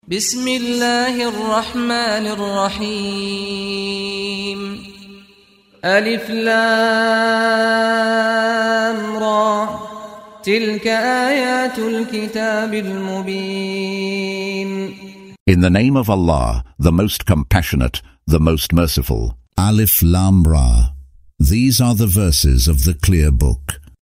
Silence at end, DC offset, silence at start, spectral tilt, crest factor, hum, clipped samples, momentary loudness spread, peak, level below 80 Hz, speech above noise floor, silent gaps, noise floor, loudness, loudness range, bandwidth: 0.2 s; under 0.1%; 0.1 s; -5 dB/octave; 16 dB; none; under 0.1%; 10 LU; 0 dBFS; -24 dBFS; 35 dB; 15.40-15.46 s; -50 dBFS; -17 LUFS; 7 LU; 16 kHz